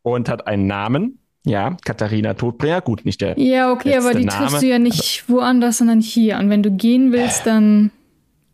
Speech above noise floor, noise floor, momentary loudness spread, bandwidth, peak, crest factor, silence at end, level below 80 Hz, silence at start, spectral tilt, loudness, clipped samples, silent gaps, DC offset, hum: 44 dB; -60 dBFS; 7 LU; 15.5 kHz; -8 dBFS; 10 dB; 0.65 s; -52 dBFS; 0.05 s; -5 dB/octave; -17 LUFS; under 0.1%; none; under 0.1%; none